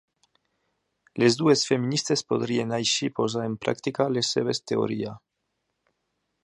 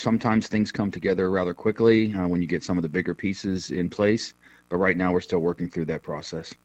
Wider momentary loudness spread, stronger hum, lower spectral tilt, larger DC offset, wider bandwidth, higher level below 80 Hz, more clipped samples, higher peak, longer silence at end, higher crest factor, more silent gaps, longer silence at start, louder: about the same, 7 LU vs 8 LU; neither; second, -4.5 dB/octave vs -6.5 dB/octave; neither; first, 11.5 kHz vs 8.6 kHz; second, -68 dBFS vs -54 dBFS; neither; about the same, -6 dBFS vs -6 dBFS; first, 1.25 s vs 0.1 s; about the same, 20 dB vs 18 dB; neither; first, 1.15 s vs 0 s; about the same, -25 LUFS vs -25 LUFS